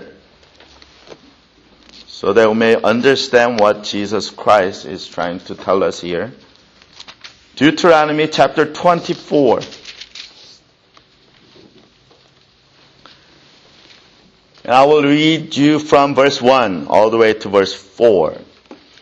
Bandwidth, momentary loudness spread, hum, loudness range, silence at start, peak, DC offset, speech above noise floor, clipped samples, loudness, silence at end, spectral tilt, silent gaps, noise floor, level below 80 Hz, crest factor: 8.6 kHz; 20 LU; none; 7 LU; 0 s; 0 dBFS; under 0.1%; 38 dB; under 0.1%; -14 LUFS; 0.3 s; -5 dB/octave; none; -52 dBFS; -54 dBFS; 16 dB